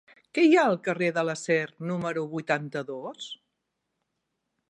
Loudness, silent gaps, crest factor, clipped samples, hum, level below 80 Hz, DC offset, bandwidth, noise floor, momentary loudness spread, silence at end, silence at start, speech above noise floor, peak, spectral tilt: -26 LUFS; none; 18 dB; under 0.1%; none; -76 dBFS; under 0.1%; 11 kHz; -81 dBFS; 17 LU; 1.35 s; 0.35 s; 55 dB; -10 dBFS; -5.5 dB/octave